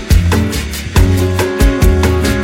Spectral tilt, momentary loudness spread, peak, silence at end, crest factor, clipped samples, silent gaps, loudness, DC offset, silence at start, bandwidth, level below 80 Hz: -5.5 dB/octave; 4 LU; 0 dBFS; 0 s; 10 dB; under 0.1%; none; -13 LUFS; under 0.1%; 0 s; 17 kHz; -16 dBFS